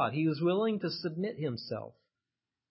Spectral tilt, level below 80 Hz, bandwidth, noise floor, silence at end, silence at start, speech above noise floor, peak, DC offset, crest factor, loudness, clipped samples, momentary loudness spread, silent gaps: -10 dB/octave; -76 dBFS; 5.8 kHz; under -90 dBFS; 0.8 s; 0 s; over 58 dB; -16 dBFS; under 0.1%; 16 dB; -33 LUFS; under 0.1%; 11 LU; none